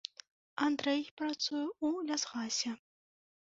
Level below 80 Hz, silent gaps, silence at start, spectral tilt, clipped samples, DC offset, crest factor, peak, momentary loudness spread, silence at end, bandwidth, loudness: -82 dBFS; 1.11-1.17 s; 0.55 s; -1 dB/octave; under 0.1%; under 0.1%; 20 dB; -16 dBFS; 9 LU; 0.65 s; 8 kHz; -35 LUFS